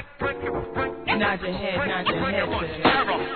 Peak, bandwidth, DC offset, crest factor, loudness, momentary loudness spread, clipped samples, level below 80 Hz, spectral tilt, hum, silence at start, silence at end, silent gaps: -6 dBFS; 4.6 kHz; 0.3%; 20 dB; -24 LUFS; 8 LU; under 0.1%; -44 dBFS; -8.5 dB/octave; none; 0 s; 0 s; none